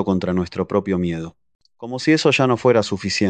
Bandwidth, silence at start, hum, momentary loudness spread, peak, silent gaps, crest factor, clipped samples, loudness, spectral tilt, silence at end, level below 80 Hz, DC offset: 9.2 kHz; 0 s; none; 15 LU; -2 dBFS; 1.55-1.59 s; 18 dB; under 0.1%; -19 LUFS; -5.5 dB/octave; 0 s; -44 dBFS; under 0.1%